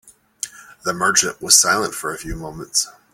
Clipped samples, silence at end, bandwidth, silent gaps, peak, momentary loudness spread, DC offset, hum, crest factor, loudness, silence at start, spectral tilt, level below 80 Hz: under 0.1%; 0.2 s; 17 kHz; none; 0 dBFS; 18 LU; under 0.1%; none; 20 dB; -17 LUFS; 0.45 s; -0.5 dB/octave; -44 dBFS